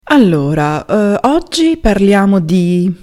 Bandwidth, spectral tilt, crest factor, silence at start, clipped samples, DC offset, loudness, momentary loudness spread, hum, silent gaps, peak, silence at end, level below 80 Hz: 12.5 kHz; -6.5 dB/octave; 10 dB; 0.05 s; under 0.1%; under 0.1%; -12 LUFS; 4 LU; none; none; 0 dBFS; 0.1 s; -30 dBFS